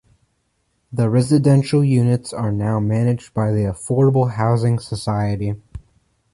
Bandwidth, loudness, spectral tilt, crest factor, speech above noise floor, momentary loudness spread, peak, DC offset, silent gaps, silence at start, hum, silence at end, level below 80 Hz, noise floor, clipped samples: 11.5 kHz; -18 LUFS; -7.5 dB/octave; 14 dB; 50 dB; 8 LU; -4 dBFS; under 0.1%; none; 0.9 s; none; 0.55 s; -44 dBFS; -67 dBFS; under 0.1%